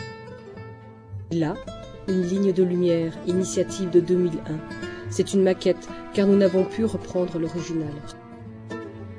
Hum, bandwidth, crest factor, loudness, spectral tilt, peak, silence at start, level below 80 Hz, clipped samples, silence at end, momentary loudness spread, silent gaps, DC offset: none; 11 kHz; 18 dB; -24 LUFS; -6.5 dB/octave; -6 dBFS; 0 s; -52 dBFS; under 0.1%; 0 s; 20 LU; none; under 0.1%